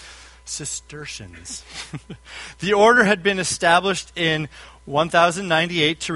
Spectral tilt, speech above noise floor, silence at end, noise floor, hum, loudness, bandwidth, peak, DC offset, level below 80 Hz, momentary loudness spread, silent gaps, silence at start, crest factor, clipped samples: -3.5 dB/octave; 21 dB; 0 s; -42 dBFS; none; -19 LUFS; 11.5 kHz; 0 dBFS; under 0.1%; -50 dBFS; 20 LU; none; 0 s; 20 dB; under 0.1%